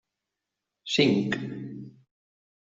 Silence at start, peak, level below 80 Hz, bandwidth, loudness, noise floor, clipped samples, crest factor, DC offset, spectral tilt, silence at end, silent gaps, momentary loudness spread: 0.85 s; -8 dBFS; -66 dBFS; 7.8 kHz; -26 LUFS; -86 dBFS; under 0.1%; 22 dB; under 0.1%; -5 dB/octave; 0.85 s; none; 21 LU